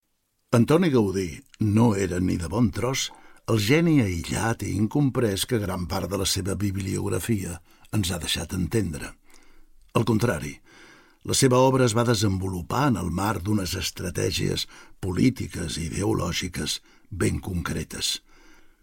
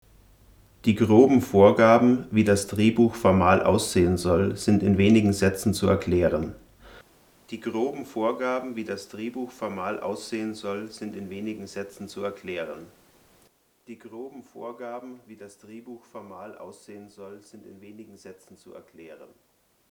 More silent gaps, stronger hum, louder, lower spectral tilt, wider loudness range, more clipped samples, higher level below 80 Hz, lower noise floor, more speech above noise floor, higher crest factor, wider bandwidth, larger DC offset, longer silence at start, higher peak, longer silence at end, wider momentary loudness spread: neither; neither; about the same, -25 LUFS vs -23 LUFS; second, -5 dB/octave vs -6.5 dB/octave; second, 5 LU vs 22 LU; neither; first, -48 dBFS vs -58 dBFS; first, -72 dBFS vs -63 dBFS; first, 48 dB vs 38 dB; about the same, 18 dB vs 22 dB; second, 16.5 kHz vs 19 kHz; neither; second, 0.5 s vs 0.85 s; about the same, -6 dBFS vs -4 dBFS; about the same, 0.65 s vs 0.65 s; second, 11 LU vs 25 LU